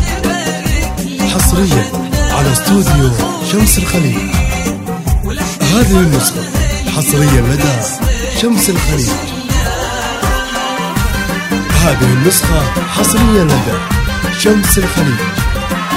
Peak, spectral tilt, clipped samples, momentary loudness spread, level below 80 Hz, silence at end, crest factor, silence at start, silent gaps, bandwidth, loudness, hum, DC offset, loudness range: 0 dBFS; -4.5 dB/octave; under 0.1%; 7 LU; -20 dBFS; 0 s; 12 dB; 0 s; none; 16.5 kHz; -12 LUFS; none; under 0.1%; 3 LU